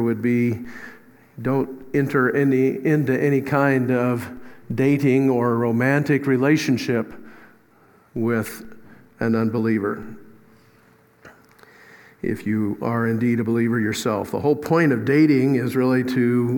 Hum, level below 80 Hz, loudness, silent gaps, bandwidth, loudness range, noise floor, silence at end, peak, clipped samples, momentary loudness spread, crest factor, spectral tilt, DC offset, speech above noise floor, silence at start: none; -60 dBFS; -21 LUFS; none; 18 kHz; 7 LU; -55 dBFS; 0 s; -4 dBFS; under 0.1%; 12 LU; 18 dB; -7 dB/octave; under 0.1%; 35 dB; 0 s